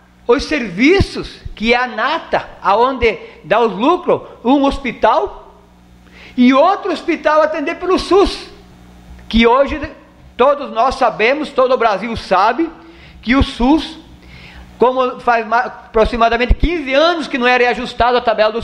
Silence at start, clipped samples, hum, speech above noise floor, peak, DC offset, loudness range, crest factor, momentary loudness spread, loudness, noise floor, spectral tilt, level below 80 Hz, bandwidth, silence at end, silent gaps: 0.3 s; under 0.1%; 60 Hz at -50 dBFS; 30 dB; 0 dBFS; under 0.1%; 2 LU; 14 dB; 8 LU; -14 LUFS; -44 dBFS; -5.5 dB/octave; -30 dBFS; 11 kHz; 0 s; none